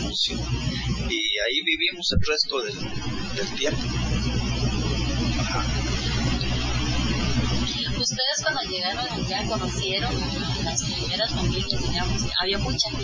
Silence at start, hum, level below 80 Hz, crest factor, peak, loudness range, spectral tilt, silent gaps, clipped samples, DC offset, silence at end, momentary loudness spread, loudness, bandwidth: 0 s; none; -32 dBFS; 18 dB; -6 dBFS; 1 LU; -4 dB/octave; none; under 0.1%; under 0.1%; 0 s; 5 LU; -25 LUFS; 7.6 kHz